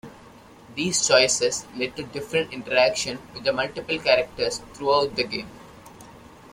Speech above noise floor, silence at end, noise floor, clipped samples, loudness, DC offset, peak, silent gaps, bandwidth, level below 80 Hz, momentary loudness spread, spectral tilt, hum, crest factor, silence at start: 24 dB; 0.05 s; -48 dBFS; under 0.1%; -23 LUFS; under 0.1%; -4 dBFS; none; 16 kHz; -56 dBFS; 12 LU; -2 dB/octave; none; 22 dB; 0.05 s